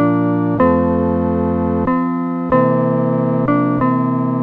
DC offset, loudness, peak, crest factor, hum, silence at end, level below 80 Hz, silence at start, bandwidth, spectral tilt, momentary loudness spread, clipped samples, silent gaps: under 0.1%; -16 LUFS; -2 dBFS; 12 dB; none; 0 s; -40 dBFS; 0 s; 4.3 kHz; -11.5 dB/octave; 3 LU; under 0.1%; none